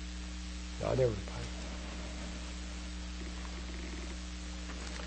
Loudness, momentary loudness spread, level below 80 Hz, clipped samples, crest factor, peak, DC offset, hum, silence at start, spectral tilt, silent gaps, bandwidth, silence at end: -40 LUFS; 10 LU; -44 dBFS; under 0.1%; 20 dB; -18 dBFS; under 0.1%; none; 0 s; -5 dB/octave; none; 8.4 kHz; 0 s